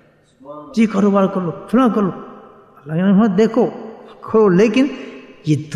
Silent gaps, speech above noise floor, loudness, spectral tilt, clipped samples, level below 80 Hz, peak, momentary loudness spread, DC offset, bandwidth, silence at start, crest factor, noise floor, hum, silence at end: none; 27 dB; -16 LUFS; -7.5 dB/octave; under 0.1%; -56 dBFS; -2 dBFS; 21 LU; under 0.1%; 10 kHz; 0.45 s; 14 dB; -42 dBFS; none; 0 s